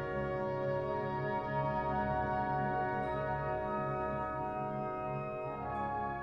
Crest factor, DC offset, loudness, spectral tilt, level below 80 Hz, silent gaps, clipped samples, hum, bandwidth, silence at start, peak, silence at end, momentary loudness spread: 12 dB; under 0.1%; -36 LUFS; -9 dB/octave; -54 dBFS; none; under 0.1%; none; 6 kHz; 0 s; -24 dBFS; 0 s; 4 LU